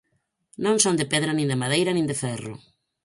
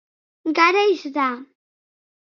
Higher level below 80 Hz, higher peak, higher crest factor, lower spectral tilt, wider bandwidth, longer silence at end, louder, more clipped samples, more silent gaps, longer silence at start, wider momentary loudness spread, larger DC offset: first, -62 dBFS vs -84 dBFS; about the same, -4 dBFS vs -2 dBFS; about the same, 22 dB vs 20 dB; first, -4 dB/octave vs -2 dB/octave; first, 11.5 kHz vs 6.8 kHz; second, 0.5 s vs 0.8 s; second, -23 LUFS vs -19 LUFS; neither; neither; first, 0.6 s vs 0.45 s; second, 11 LU vs 14 LU; neither